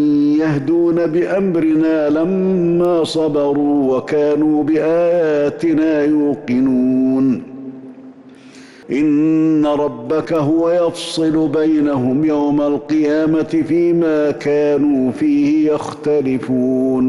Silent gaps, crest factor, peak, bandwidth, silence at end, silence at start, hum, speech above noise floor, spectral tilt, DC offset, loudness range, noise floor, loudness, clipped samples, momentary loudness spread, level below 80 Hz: none; 6 dB; -8 dBFS; 11.5 kHz; 0 s; 0 s; none; 25 dB; -7.5 dB/octave; under 0.1%; 2 LU; -39 dBFS; -15 LUFS; under 0.1%; 4 LU; -52 dBFS